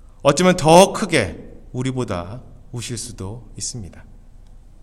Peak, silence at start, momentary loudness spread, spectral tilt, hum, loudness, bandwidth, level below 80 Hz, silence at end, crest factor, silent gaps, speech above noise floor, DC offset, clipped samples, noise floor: 0 dBFS; 0.25 s; 23 LU; -4.5 dB/octave; none; -18 LUFS; 16 kHz; -42 dBFS; 0.3 s; 20 dB; none; 24 dB; under 0.1%; under 0.1%; -42 dBFS